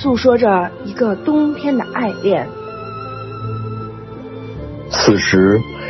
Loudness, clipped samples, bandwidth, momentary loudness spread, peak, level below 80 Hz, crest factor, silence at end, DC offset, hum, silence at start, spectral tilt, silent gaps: -16 LUFS; under 0.1%; 6.2 kHz; 17 LU; 0 dBFS; -42 dBFS; 16 dB; 0 s; under 0.1%; none; 0 s; -5.5 dB/octave; none